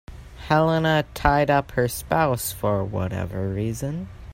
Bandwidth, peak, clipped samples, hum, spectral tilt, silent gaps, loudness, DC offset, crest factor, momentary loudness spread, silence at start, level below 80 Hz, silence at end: 16 kHz; -2 dBFS; under 0.1%; none; -5.5 dB/octave; none; -23 LUFS; under 0.1%; 20 dB; 9 LU; 0.1 s; -40 dBFS; 0 s